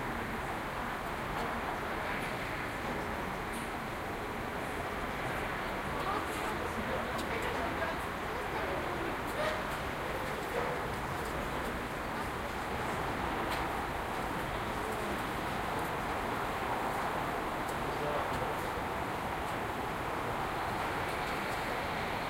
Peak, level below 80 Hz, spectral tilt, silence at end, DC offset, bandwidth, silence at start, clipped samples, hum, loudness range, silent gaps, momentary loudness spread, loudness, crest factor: -20 dBFS; -50 dBFS; -4.5 dB/octave; 0 s; under 0.1%; 16 kHz; 0 s; under 0.1%; none; 2 LU; none; 3 LU; -36 LUFS; 16 dB